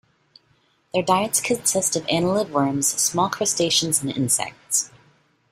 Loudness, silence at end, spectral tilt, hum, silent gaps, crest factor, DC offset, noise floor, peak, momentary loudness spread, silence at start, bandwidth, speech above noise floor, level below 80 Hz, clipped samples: -21 LUFS; 0.65 s; -3 dB/octave; none; none; 20 dB; under 0.1%; -63 dBFS; -4 dBFS; 4 LU; 0.95 s; 16 kHz; 41 dB; -60 dBFS; under 0.1%